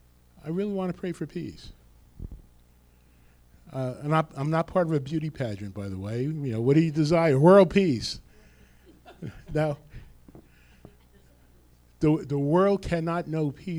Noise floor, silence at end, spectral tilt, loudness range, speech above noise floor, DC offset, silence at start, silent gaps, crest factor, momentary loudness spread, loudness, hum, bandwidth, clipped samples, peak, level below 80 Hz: -58 dBFS; 0 s; -7.5 dB/octave; 14 LU; 33 dB; under 0.1%; 0.45 s; none; 20 dB; 19 LU; -25 LUFS; none; 11.5 kHz; under 0.1%; -6 dBFS; -50 dBFS